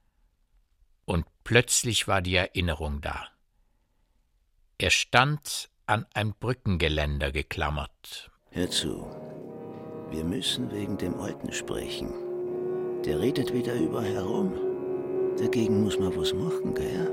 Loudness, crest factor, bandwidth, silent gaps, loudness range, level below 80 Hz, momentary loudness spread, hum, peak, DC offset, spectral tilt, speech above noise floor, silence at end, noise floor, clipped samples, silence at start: -28 LUFS; 26 dB; 16.5 kHz; none; 5 LU; -44 dBFS; 15 LU; none; -4 dBFS; under 0.1%; -4 dB/octave; 41 dB; 0 s; -68 dBFS; under 0.1%; 1.1 s